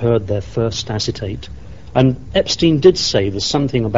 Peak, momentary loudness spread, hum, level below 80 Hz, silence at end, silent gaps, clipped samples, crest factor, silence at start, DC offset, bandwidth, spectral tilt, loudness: 0 dBFS; 14 LU; none; -36 dBFS; 0 s; none; under 0.1%; 16 dB; 0 s; 1%; 8 kHz; -5.5 dB/octave; -16 LUFS